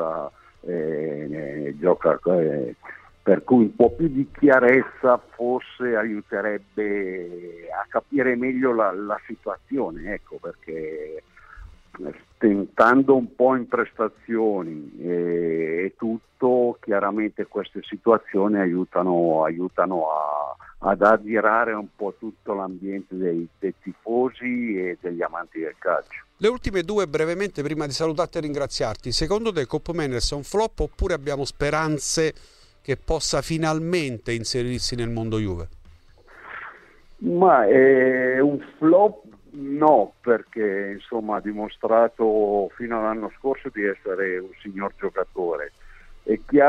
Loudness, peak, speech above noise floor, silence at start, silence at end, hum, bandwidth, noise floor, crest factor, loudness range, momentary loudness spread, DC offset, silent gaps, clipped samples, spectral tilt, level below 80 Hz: -23 LUFS; -4 dBFS; 27 dB; 0 s; 0 s; none; 13 kHz; -49 dBFS; 20 dB; 8 LU; 15 LU; under 0.1%; none; under 0.1%; -5.5 dB/octave; -44 dBFS